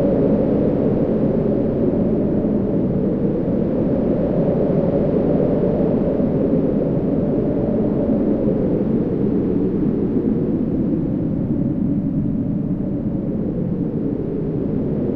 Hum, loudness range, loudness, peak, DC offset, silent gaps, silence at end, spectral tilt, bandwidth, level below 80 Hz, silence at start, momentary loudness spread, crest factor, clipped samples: none; 3 LU; -19 LUFS; -6 dBFS; under 0.1%; none; 0 s; -12.5 dB/octave; 4.5 kHz; -36 dBFS; 0 s; 4 LU; 12 dB; under 0.1%